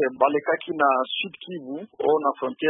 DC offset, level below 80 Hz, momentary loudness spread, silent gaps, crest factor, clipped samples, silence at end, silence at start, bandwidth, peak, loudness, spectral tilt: under 0.1%; -76 dBFS; 13 LU; none; 20 dB; under 0.1%; 0 s; 0 s; 4 kHz; -4 dBFS; -24 LUFS; -9 dB/octave